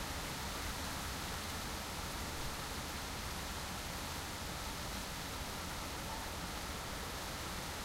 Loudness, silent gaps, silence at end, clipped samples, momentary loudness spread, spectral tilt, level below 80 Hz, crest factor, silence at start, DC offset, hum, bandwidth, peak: -42 LUFS; none; 0 s; under 0.1%; 1 LU; -3 dB/octave; -50 dBFS; 14 dB; 0 s; under 0.1%; none; 16 kHz; -28 dBFS